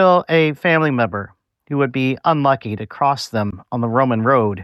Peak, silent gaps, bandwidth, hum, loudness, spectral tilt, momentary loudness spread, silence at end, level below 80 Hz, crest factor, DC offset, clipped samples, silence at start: -4 dBFS; none; 13 kHz; none; -18 LUFS; -7 dB/octave; 9 LU; 0 s; -56 dBFS; 14 dB; under 0.1%; under 0.1%; 0 s